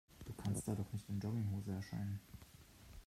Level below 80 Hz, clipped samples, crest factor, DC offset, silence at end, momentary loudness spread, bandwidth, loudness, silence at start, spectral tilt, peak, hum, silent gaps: -64 dBFS; under 0.1%; 16 dB; under 0.1%; 0 s; 18 LU; 15 kHz; -44 LUFS; 0.1 s; -6.5 dB/octave; -28 dBFS; none; none